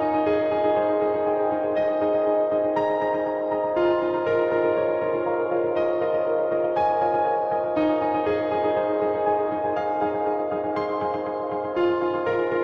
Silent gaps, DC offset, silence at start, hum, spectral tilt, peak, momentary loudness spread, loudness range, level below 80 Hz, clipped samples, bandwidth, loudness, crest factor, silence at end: none; under 0.1%; 0 s; none; -8 dB/octave; -10 dBFS; 3 LU; 2 LU; -62 dBFS; under 0.1%; 5.8 kHz; -23 LUFS; 12 dB; 0 s